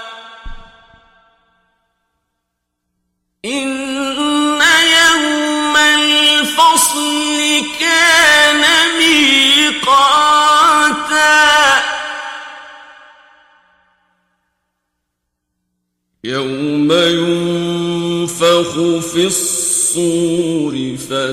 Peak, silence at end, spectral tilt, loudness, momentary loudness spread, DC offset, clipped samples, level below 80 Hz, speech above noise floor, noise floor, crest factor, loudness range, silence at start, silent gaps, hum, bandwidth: 0 dBFS; 0 s; -2 dB/octave; -11 LUFS; 12 LU; under 0.1%; under 0.1%; -46 dBFS; 58 dB; -73 dBFS; 14 dB; 14 LU; 0 s; none; 60 Hz at -60 dBFS; 16.5 kHz